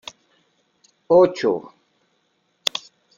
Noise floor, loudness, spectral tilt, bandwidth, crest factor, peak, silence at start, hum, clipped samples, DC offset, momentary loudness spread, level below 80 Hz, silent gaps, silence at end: -68 dBFS; -20 LUFS; -4.5 dB/octave; 15 kHz; 22 dB; -2 dBFS; 1.1 s; none; under 0.1%; under 0.1%; 16 LU; -66 dBFS; none; 0.4 s